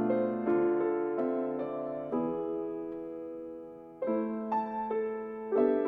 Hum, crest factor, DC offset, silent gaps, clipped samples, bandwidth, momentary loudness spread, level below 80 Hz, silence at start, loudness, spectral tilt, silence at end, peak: none; 16 dB; under 0.1%; none; under 0.1%; 4.3 kHz; 12 LU; -70 dBFS; 0 s; -33 LUFS; -10 dB/octave; 0 s; -16 dBFS